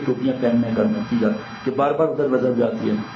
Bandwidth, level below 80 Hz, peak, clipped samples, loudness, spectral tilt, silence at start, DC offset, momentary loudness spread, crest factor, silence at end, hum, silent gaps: 6.4 kHz; -58 dBFS; -6 dBFS; under 0.1%; -21 LUFS; -8.5 dB/octave; 0 s; under 0.1%; 4 LU; 14 dB; 0 s; none; none